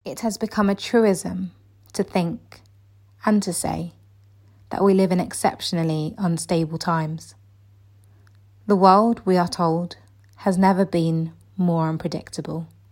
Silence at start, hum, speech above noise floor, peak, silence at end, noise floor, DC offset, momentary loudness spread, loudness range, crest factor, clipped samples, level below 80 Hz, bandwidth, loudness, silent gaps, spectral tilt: 0.05 s; none; 32 dB; -2 dBFS; 0.25 s; -53 dBFS; under 0.1%; 14 LU; 6 LU; 22 dB; under 0.1%; -56 dBFS; 16.5 kHz; -22 LUFS; none; -6 dB/octave